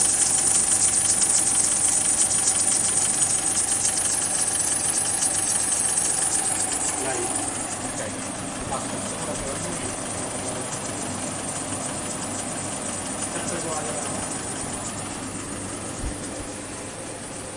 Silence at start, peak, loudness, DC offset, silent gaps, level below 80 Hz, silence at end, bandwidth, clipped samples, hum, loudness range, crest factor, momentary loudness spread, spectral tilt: 0 s; -6 dBFS; -22 LUFS; under 0.1%; none; -48 dBFS; 0 s; 11.5 kHz; under 0.1%; none; 10 LU; 18 dB; 13 LU; -1.5 dB/octave